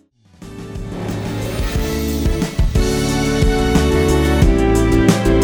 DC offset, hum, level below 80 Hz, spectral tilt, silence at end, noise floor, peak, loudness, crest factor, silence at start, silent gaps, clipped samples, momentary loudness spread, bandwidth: under 0.1%; none; -20 dBFS; -6 dB/octave; 0 s; -40 dBFS; 0 dBFS; -17 LUFS; 16 dB; 0.4 s; none; under 0.1%; 13 LU; 19.5 kHz